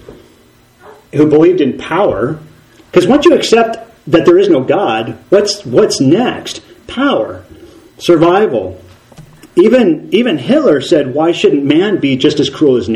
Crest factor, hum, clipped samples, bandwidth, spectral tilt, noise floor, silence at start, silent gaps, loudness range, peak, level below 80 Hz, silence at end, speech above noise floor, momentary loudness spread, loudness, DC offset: 12 dB; none; 0.5%; 12 kHz; -5.5 dB/octave; -46 dBFS; 0.1 s; none; 3 LU; 0 dBFS; -46 dBFS; 0 s; 36 dB; 11 LU; -11 LUFS; under 0.1%